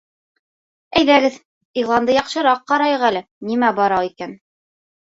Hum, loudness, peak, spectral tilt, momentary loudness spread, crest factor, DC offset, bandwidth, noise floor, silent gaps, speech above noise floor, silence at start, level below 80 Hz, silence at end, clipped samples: none; -17 LUFS; -2 dBFS; -4.5 dB/octave; 12 LU; 16 dB; under 0.1%; 8 kHz; under -90 dBFS; 1.45-1.74 s, 3.31-3.41 s; over 73 dB; 0.9 s; -56 dBFS; 0.7 s; under 0.1%